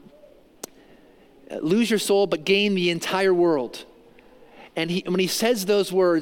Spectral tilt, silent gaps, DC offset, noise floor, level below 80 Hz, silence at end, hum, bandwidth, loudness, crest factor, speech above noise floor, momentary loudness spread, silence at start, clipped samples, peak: -4.5 dB/octave; none; under 0.1%; -52 dBFS; -64 dBFS; 0 s; none; 17 kHz; -22 LUFS; 16 dB; 31 dB; 19 LU; 1.5 s; under 0.1%; -8 dBFS